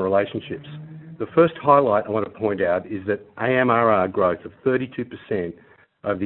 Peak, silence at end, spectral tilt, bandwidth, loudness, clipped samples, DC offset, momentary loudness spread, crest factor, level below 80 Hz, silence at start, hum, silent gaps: -2 dBFS; 0 s; -11.5 dB/octave; 4.2 kHz; -21 LUFS; under 0.1%; under 0.1%; 16 LU; 20 dB; -60 dBFS; 0 s; none; none